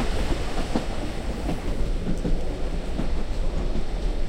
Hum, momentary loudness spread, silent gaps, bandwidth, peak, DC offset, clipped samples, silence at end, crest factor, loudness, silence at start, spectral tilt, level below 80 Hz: none; 3 LU; none; 10.5 kHz; -10 dBFS; under 0.1%; under 0.1%; 0 s; 12 dB; -30 LUFS; 0 s; -6 dB/octave; -26 dBFS